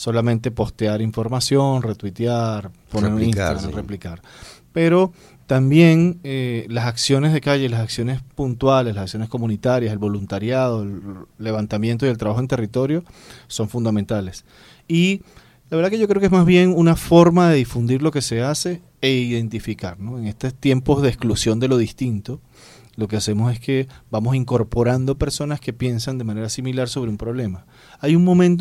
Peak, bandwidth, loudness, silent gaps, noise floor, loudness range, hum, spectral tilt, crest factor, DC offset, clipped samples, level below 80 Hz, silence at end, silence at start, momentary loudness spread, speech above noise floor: 0 dBFS; 14.5 kHz; -19 LUFS; none; -47 dBFS; 7 LU; none; -6.5 dB/octave; 18 dB; under 0.1%; under 0.1%; -42 dBFS; 0 s; 0 s; 14 LU; 28 dB